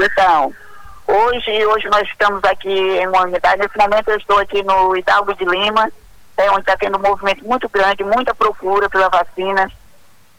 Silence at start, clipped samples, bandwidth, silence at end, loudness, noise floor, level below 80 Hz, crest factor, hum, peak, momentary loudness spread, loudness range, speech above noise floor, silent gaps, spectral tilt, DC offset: 0 s; under 0.1%; 19 kHz; 0.65 s; -15 LUFS; -50 dBFS; -44 dBFS; 14 dB; none; -2 dBFS; 4 LU; 1 LU; 36 dB; none; -4 dB/octave; under 0.1%